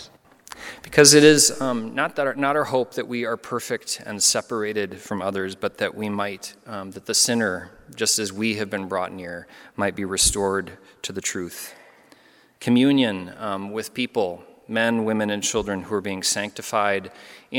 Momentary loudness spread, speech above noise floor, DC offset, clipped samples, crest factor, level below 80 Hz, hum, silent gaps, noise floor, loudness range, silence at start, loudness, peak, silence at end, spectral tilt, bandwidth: 17 LU; 31 dB; under 0.1%; under 0.1%; 22 dB; -50 dBFS; none; none; -54 dBFS; 7 LU; 0 s; -22 LUFS; 0 dBFS; 0 s; -2.5 dB/octave; 17.5 kHz